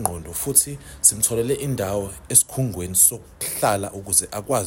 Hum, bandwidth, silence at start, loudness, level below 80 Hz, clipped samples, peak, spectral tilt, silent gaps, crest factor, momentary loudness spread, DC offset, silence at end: none; 16.5 kHz; 0 s; -19 LUFS; -48 dBFS; under 0.1%; 0 dBFS; -3 dB/octave; none; 22 dB; 12 LU; under 0.1%; 0 s